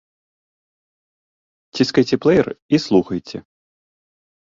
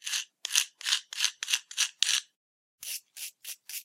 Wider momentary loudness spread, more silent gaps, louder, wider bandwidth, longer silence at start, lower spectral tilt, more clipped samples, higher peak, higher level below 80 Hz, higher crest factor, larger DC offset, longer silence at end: first, 17 LU vs 13 LU; second, 2.62-2.69 s vs 2.36-2.78 s; first, -18 LUFS vs -29 LUFS; second, 7.6 kHz vs 16 kHz; first, 1.75 s vs 0.05 s; first, -6 dB/octave vs 7.5 dB/octave; neither; about the same, -2 dBFS vs 0 dBFS; first, -54 dBFS vs under -90 dBFS; second, 20 dB vs 32 dB; neither; first, 1.2 s vs 0 s